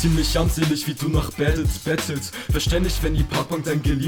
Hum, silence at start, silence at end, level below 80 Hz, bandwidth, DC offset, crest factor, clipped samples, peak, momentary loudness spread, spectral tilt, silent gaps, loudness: none; 0 s; 0 s; -26 dBFS; 19 kHz; under 0.1%; 14 dB; under 0.1%; -8 dBFS; 4 LU; -5 dB/octave; none; -22 LUFS